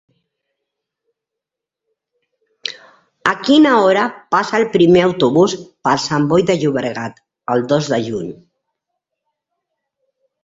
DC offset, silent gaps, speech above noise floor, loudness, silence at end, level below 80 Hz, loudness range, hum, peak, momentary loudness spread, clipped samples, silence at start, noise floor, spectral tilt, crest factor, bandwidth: under 0.1%; none; 69 dB; -15 LUFS; 2.1 s; -56 dBFS; 9 LU; none; 0 dBFS; 16 LU; under 0.1%; 2.65 s; -83 dBFS; -5.5 dB/octave; 18 dB; 7.8 kHz